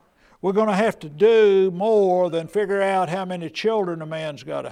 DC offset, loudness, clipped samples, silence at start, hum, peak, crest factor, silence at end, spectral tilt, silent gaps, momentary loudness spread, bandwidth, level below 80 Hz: under 0.1%; -21 LUFS; under 0.1%; 0.45 s; none; -6 dBFS; 14 dB; 0 s; -6.5 dB/octave; none; 13 LU; 11 kHz; -66 dBFS